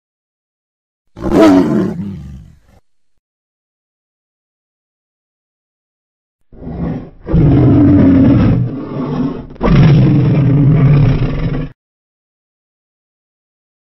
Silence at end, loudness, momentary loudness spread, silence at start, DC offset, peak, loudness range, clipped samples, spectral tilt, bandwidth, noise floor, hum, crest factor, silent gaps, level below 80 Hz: 2.25 s; -11 LUFS; 16 LU; 1.15 s; under 0.1%; 0 dBFS; 12 LU; under 0.1%; -9.5 dB/octave; 7.6 kHz; -53 dBFS; none; 14 dB; 3.19-6.39 s; -28 dBFS